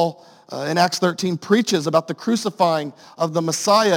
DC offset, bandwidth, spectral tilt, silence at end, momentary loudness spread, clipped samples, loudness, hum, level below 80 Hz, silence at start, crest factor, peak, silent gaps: under 0.1%; 17 kHz; -4.5 dB/octave; 0 s; 8 LU; under 0.1%; -20 LUFS; none; -70 dBFS; 0 s; 18 dB; -2 dBFS; none